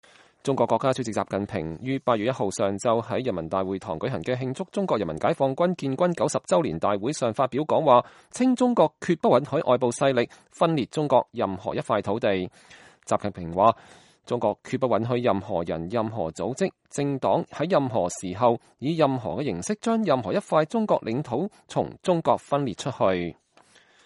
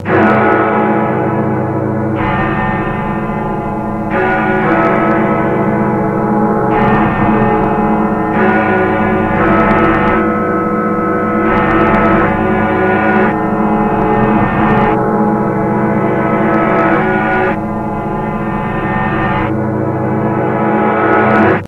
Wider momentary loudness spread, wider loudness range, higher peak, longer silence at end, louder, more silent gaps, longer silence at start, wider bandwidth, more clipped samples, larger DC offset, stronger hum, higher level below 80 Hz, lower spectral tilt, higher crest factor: about the same, 8 LU vs 6 LU; about the same, 4 LU vs 3 LU; second, -4 dBFS vs 0 dBFS; first, 0.75 s vs 0 s; second, -25 LUFS vs -12 LUFS; neither; first, 0.45 s vs 0 s; first, 11.5 kHz vs 5.6 kHz; neither; neither; neither; second, -60 dBFS vs -32 dBFS; second, -6 dB/octave vs -9 dB/octave; first, 20 dB vs 12 dB